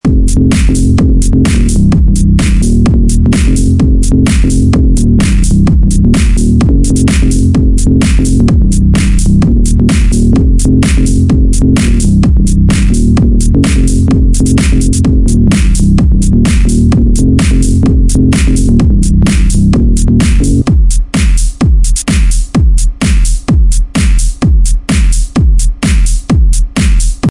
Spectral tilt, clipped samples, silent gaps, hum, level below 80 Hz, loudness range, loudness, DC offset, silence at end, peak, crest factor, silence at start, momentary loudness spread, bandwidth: -6 dB/octave; under 0.1%; none; none; -8 dBFS; 2 LU; -9 LUFS; 1%; 0 s; 0 dBFS; 6 dB; 0.05 s; 3 LU; 11.5 kHz